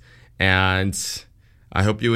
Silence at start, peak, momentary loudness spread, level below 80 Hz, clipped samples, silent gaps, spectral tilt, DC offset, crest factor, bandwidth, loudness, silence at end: 0.4 s; 0 dBFS; 11 LU; -44 dBFS; under 0.1%; none; -4.5 dB/octave; under 0.1%; 22 dB; 15 kHz; -21 LUFS; 0 s